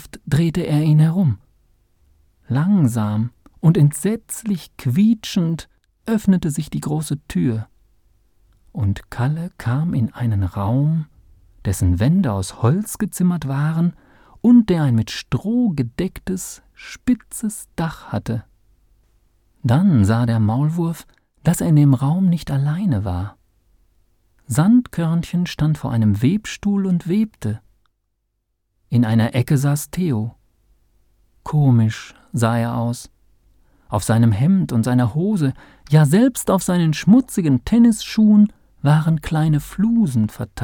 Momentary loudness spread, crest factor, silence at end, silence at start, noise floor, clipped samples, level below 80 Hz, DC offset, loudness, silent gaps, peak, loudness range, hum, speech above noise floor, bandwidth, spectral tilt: 12 LU; 16 dB; 0 s; 0 s; -71 dBFS; under 0.1%; -44 dBFS; under 0.1%; -19 LUFS; none; -2 dBFS; 7 LU; none; 54 dB; 18 kHz; -7 dB/octave